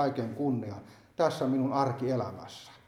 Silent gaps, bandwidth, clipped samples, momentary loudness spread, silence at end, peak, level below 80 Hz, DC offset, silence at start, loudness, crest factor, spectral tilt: none; 13.5 kHz; under 0.1%; 17 LU; 0.1 s; -12 dBFS; -72 dBFS; under 0.1%; 0 s; -31 LUFS; 18 dB; -7 dB/octave